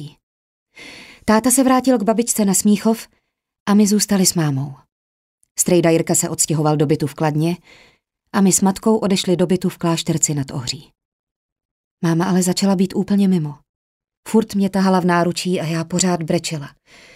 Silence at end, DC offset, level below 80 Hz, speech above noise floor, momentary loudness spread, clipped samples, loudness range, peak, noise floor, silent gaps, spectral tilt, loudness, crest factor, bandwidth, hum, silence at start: 0.45 s; under 0.1%; -54 dBFS; 23 dB; 12 LU; under 0.1%; 3 LU; 0 dBFS; -40 dBFS; 0.23-0.66 s, 3.60-3.66 s, 4.92-5.38 s, 5.51-5.55 s, 11.05-11.56 s, 11.65-11.97 s, 13.69-14.00 s, 14.17-14.23 s; -5 dB/octave; -17 LUFS; 18 dB; 16 kHz; none; 0 s